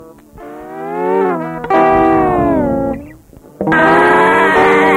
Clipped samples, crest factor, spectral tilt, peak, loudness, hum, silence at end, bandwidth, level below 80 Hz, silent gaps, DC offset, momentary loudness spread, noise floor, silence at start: under 0.1%; 12 dB; -6.5 dB/octave; -2 dBFS; -12 LUFS; none; 0 s; 15.5 kHz; -38 dBFS; none; under 0.1%; 18 LU; -39 dBFS; 0 s